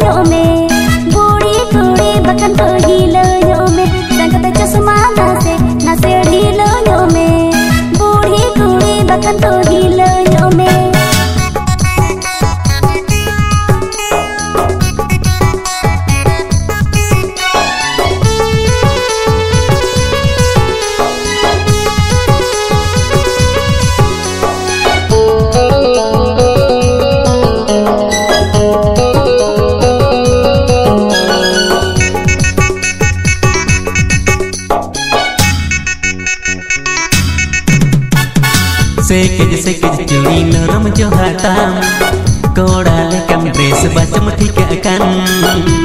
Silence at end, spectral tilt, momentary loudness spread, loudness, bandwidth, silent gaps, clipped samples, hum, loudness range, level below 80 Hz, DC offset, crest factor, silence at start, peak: 0 s; -5 dB/octave; 4 LU; -10 LUFS; 16.5 kHz; none; 0.5%; none; 3 LU; -22 dBFS; under 0.1%; 10 dB; 0 s; 0 dBFS